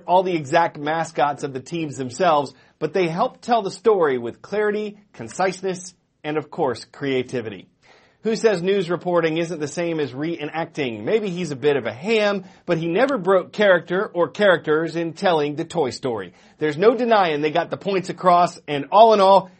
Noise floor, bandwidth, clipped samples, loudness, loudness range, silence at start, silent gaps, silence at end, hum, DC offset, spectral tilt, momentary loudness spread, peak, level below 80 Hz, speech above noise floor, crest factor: -54 dBFS; 8.8 kHz; under 0.1%; -21 LUFS; 5 LU; 0.05 s; none; 0.15 s; none; under 0.1%; -5.5 dB/octave; 11 LU; 0 dBFS; -66 dBFS; 34 dB; 20 dB